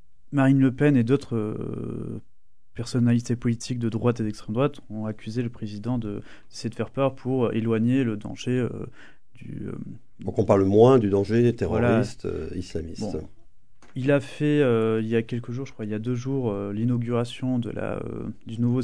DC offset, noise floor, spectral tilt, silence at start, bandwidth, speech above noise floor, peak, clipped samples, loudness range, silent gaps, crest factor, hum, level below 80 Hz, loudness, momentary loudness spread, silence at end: 0.9%; -54 dBFS; -7.5 dB/octave; 0.3 s; 10.5 kHz; 30 dB; -4 dBFS; under 0.1%; 6 LU; none; 20 dB; none; -50 dBFS; -25 LUFS; 15 LU; 0 s